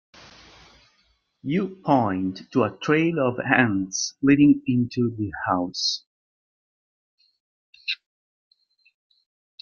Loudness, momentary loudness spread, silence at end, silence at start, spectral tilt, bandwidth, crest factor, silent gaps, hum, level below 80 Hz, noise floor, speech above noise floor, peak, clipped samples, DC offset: -23 LUFS; 12 LU; 1.65 s; 1.45 s; -5 dB/octave; 7.2 kHz; 22 dB; 6.06-7.18 s, 7.40-7.73 s; none; -62 dBFS; -67 dBFS; 45 dB; -2 dBFS; under 0.1%; under 0.1%